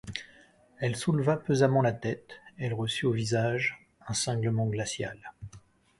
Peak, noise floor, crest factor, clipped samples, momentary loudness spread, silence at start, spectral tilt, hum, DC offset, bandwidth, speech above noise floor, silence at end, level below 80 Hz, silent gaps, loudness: -10 dBFS; -59 dBFS; 20 dB; under 0.1%; 19 LU; 0.05 s; -5 dB/octave; none; under 0.1%; 11.5 kHz; 30 dB; 0.4 s; -60 dBFS; none; -29 LUFS